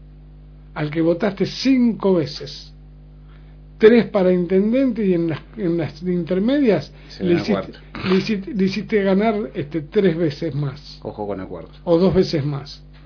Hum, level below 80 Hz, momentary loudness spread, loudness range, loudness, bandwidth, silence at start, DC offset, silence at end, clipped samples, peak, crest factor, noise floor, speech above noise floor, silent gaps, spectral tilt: 50 Hz at -40 dBFS; -44 dBFS; 14 LU; 3 LU; -19 LUFS; 5.4 kHz; 0 s; under 0.1%; 0 s; under 0.1%; 0 dBFS; 20 dB; -42 dBFS; 23 dB; none; -7.5 dB/octave